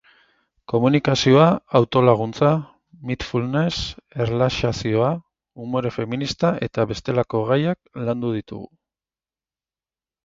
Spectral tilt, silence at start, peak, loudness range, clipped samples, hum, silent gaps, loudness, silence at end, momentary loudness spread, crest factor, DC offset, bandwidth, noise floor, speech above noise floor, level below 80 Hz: -6.5 dB/octave; 0.7 s; 0 dBFS; 6 LU; under 0.1%; none; none; -21 LUFS; 1.6 s; 12 LU; 22 dB; under 0.1%; 7.6 kHz; under -90 dBFS; over 70 dB; -48 dBFS